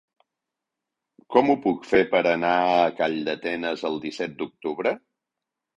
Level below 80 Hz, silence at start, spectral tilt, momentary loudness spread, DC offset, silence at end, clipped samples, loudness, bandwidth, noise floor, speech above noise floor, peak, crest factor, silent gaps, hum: -64 dBFS; 1.3 s; -6 dB/octave; 11 LU; under 0.1%; 0.8 s; under 0.1%; -24 LUFS; 8.2 kHz; -86 dBFS; 63 dB; -2 dBFS; 22 dB; none; none